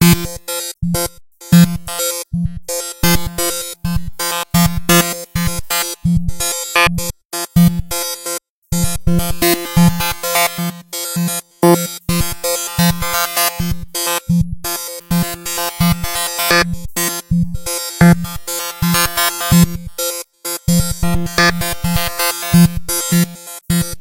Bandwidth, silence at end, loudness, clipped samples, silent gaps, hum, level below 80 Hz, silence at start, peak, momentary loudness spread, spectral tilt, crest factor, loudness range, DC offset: 17 kHz; 0 s; -16 LUFS; under 0.1%; 7.25-7.30 s, 8.50-8.62 s; none; -30 dBFS; 0 s; 0 dBFS; 9 LU; -4 dB/octave; 16 dB; 2 LU; under 0.1%